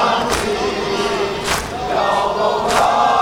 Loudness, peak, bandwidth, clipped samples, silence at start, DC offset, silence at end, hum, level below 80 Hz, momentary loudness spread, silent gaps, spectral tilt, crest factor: -17 LUFS; 0 dBFS; 19.5 kHz; under 0.1%; 0 s; 0.3%; 0 s; none; -38 dBFS; 6 LU; none; -3 dB/octave; 16 dB